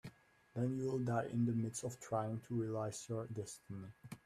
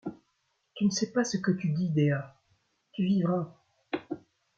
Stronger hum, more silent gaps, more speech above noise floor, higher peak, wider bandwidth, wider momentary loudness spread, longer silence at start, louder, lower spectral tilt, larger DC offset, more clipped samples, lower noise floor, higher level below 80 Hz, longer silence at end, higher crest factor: neither; neither; second, 21 dB vs 48 dB; second, -24 dBFS vs -14 dBFS; first, 14 kHz vs 7.8 kHz; second, 13 LU vs 16 LU; about the same, 0.05 s vs 0.05 s; second, -41 LUFS vs -29 LUFS; about the same, -6.5 dB/octave vs -6 dB/octave; neither; neither; second, -61 dBFS vs -76 dBFS; about the same, -74 dBFS vs -70 dBFS; second, 0.1 s vs 0.4 s; about the same, 18 dB vs 16 dB